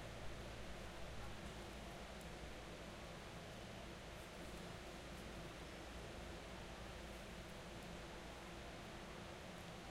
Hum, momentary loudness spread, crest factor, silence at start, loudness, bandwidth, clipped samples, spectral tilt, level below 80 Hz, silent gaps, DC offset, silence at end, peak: none; 1 LU; 14 dB; 0 s; -53 LUFS; 16 kHz; under 0.1%; -4.5 dB/octave; -60 dBFS; none; under 0.1%; 0 s; -38 dBFS